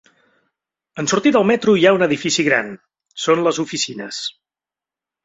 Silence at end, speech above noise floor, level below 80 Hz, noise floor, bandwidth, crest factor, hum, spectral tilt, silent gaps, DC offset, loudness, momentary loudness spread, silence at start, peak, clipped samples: 0.95 s; 73 dB; -62 dBFS; -89 dBFS; 8 kHz; 18 dB; none; -4 dB/octave; none; under 0.1%; -17 LUFS; 14 LU; 0.95 s; -2 dBFS; under 0.1%